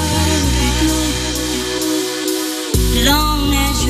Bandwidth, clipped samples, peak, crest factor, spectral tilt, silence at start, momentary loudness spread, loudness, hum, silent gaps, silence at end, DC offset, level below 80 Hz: 14.5 kHz; under 0.1%; -2 dBFS; 14 dB; -3.5 dB/octave; 0 s; 6 LU; -16 LUFS; none; none; 0 s; under 0.1%; -22 dBFS